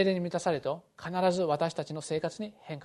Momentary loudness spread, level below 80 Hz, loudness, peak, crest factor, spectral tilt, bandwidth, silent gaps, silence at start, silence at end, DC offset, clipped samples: 10 LU; -70 dBFS; -32 LUFS; -12 dBFS; 18 dB; -5.5 dB/octave; 12 kHz; none; 0 s; 0 s; under 0.1%; under 0.1%